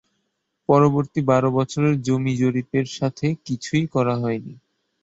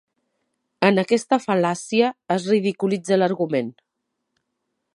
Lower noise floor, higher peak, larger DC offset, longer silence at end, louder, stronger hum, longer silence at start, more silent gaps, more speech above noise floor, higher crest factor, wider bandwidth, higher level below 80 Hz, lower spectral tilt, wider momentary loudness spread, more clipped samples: second, -74 dBFS vs -78 dBFS; second, -4 dBFS vs 0 dBFS; neither; second, 0.5 s vs 1.25 s; about the same, -21 LUFS vs -21 LUFS; neither; about the same, 0.7 s vs 0.8 s; neither; second, 54 dB vs 58 dB; about the same, 18 dB vs 22 dB; second, 8 kHz vs 11.5 kHz; first, -58 dBFS vs -72 dBFS; first, -7 dB/octave vs -5.5 dB/octave; first, 9 LU vs 5 LU; neither